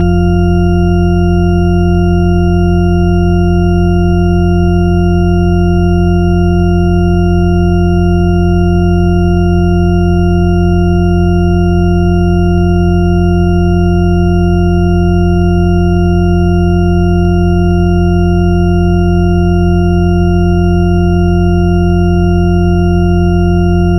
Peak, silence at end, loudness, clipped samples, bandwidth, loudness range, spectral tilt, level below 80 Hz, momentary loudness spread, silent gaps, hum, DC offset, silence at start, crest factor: 0 dBFS; 0 s; -10 LUFS; under 0.1%; 11.5 kHz; 0 LU; -9 dB/octave; -16 dBFS; 0 LU; none; none; under 0.1%; 0 s; 8 dB